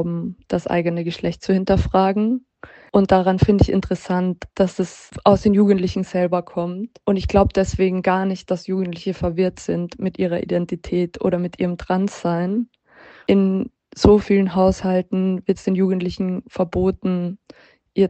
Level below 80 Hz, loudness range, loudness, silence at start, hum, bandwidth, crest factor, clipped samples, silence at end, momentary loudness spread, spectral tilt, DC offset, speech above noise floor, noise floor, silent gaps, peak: -36 dBFS; 4 LU; -20 LUFS; 0 s; none; 8.4 kHz; 18 dB; under 0.1%; 0 s; 10 LU; -7.5 dB/octave; under 0.1%; 28 dB; -47 dBFS; none; 0 dBFS